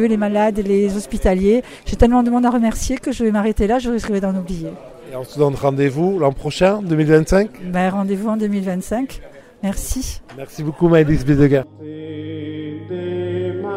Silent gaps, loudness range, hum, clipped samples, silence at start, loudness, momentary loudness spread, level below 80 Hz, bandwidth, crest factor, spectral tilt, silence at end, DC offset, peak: none; 3 LU; none; under 0.1%; 0 s; -18 LUFS; 15 LU; -32 dBFS; 16 kHz; 18 dB; -6.5 dB/octave; 0 s; under 0.1%; 0 dBFS